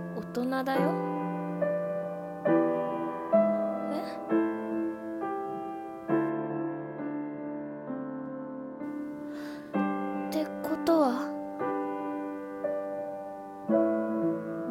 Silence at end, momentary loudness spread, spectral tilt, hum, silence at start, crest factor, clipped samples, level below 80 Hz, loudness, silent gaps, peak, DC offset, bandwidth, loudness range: 0 s; 12 LU; -7.5 dB/octave; none; 0 s; 20 dB; under 0.1%; -72 dBFS; -31 LUFS; none; -12 dBFS; under 0.1%; 16.5 kHz; 6 LU